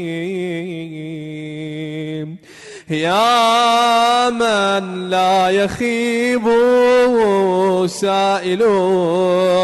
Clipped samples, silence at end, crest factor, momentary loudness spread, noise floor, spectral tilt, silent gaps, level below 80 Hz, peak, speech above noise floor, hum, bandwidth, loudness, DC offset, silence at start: under 0.1%; 0 s; 10 dB; 15 LU; -38 dBFS; -4.5 dB/octave; none; -54 dBFS; -6 dBFS; 23 dB; none; 12.5 kHz; -15 LUFS; under 0.1%; 0 s